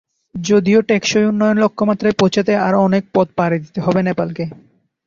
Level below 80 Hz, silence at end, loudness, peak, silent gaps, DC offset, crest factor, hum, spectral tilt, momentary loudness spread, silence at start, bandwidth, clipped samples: -54 dBFS; 0.55 s; -16 LUFS; -2 dBFS; none; under 0.1%; 14 dB; none; -6 dB/octave; 8 LU; 0.35 s; 7.4 kHz; under 0.1%